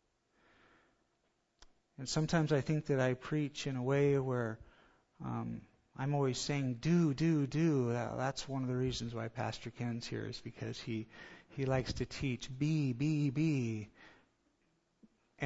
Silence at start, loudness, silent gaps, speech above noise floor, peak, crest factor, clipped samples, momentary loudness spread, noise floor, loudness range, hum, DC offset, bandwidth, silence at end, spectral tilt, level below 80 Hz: 1.6 s; -36 LUFS; none; 44 dB; -18 dBFS; 18 dB; under 0.1%; 12 LU; -79 dBFS; 5 LU; none; under 0.1%; 7.6 kHz; 0 s; -6.5 dB/octave; -60 dBFS